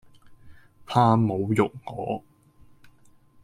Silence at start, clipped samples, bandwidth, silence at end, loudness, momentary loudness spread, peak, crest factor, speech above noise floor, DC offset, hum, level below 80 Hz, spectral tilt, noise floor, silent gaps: 0.3 s; under 0.1%; 11.5 kHz; 1.25 s; -24 LUFS; 13 LU; -6 dBFS; 22 dB; 32 dB; under 0.1%; none; -60 dBFS; -8 dB/octave; -55 dBFS; none